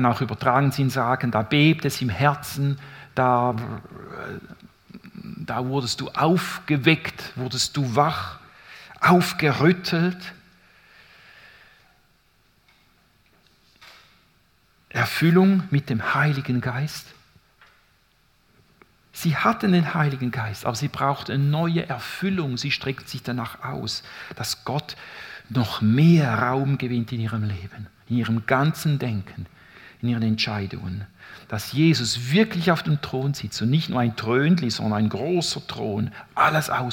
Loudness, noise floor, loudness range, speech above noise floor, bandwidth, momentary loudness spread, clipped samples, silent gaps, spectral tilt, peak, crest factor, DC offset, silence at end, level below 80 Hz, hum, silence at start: -23 LUFS; -62 dBFS; 6 LU; 39 dB; 17.5 kHz; 17 LU; under 0.1%; none; -6 dB/octave; -2 dBFS; 22 dB; under 0.1%; 0 s; -58 dBFS; none; 0 s